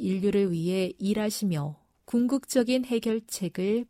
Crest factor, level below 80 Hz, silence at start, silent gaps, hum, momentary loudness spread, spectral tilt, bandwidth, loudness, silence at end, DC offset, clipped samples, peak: 16 dB; -62 dBFS; 0 s; none; none; 5 LU; -5.5 dB/octave; 16 kHz; -28 LUFS; 0.05 s; under 0.1%; under 0.1%; -10 dBFS